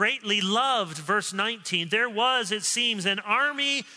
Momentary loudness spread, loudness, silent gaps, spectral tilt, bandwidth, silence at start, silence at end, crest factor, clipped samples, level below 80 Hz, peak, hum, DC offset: 4 LU; -24 LUFS; none; -2 dB/octave; 11 kHz; 0 s; 0 s; 16 dB; under 0.1%; -82 dBFS; -10 dBFS; none; under 0.1%